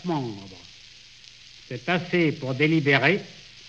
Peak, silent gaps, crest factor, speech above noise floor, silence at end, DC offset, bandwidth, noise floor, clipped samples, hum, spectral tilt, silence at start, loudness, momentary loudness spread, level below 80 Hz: -6 dBFS; none; 20 dB; 25 dB; 0 s; under 0.1%; 8 kHz; -49 dBFS; under 0.1%; none; -6.5 dB/octave; 0 s; -23 LUFS; 24 LU; -64 dBFS